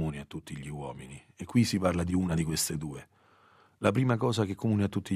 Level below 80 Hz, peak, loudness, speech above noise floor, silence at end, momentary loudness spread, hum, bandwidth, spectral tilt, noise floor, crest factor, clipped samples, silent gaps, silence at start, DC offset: -54 dBFS; -8 dBFS; -30 LUFS; 32 dB; 0 s; 14 LU; none; 15 kHz; -5.5 dB/octave; -62 dBFS; 22 dB; under 0.1%; none; 0 s; under 0.1%